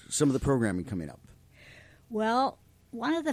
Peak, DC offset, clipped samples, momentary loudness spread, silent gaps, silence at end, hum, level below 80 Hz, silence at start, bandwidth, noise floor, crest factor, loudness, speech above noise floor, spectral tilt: -12 dBFS; under 0.1%; under 0.1%; 12 LU; none; 0 s; none; -52 dBFS; 0.1 s; 16 kHz; -54 dBFS; 18 dB; -29 LUFS; 26 dB; -5 dB/octave